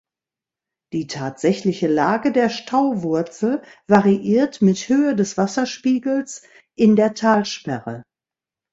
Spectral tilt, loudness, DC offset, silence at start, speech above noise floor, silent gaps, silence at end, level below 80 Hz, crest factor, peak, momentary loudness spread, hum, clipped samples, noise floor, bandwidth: -6 dB/octave; -19 LUFS; under 0.1%; 0.95 s; 71 dB; none; 0.7 s; -60 dBFS; 20 dB; 0 dBFS; 12 LU; none; under 0.1%; -89 dBFS; 8 kHz